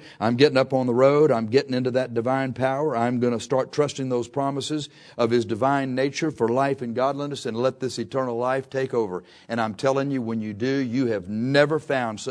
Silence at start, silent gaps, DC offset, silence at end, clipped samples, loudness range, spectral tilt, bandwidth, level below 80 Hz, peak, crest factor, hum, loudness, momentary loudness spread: 0 s; none; under 0.1%; 0 s; under 0.1%; 4 LU; -6 dB/octave; 11 kHz; -66 dBFS; -2 dBFS; 20 dB; none; -24 LUFS; 8 LU